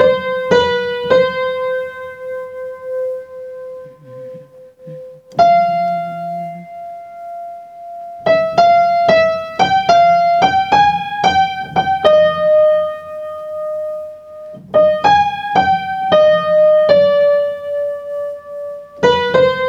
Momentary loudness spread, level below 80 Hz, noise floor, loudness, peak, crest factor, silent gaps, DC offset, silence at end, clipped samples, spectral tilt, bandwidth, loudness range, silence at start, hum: 20 LU; -52 dBFS; -39 dBFS; -14 LUFS; 0 dBFS; 14 dB; none; under 0.1%; 0 s; under 0.1%; -5 dB/octave; 7.8 kHz; 8 LU; 0 s; none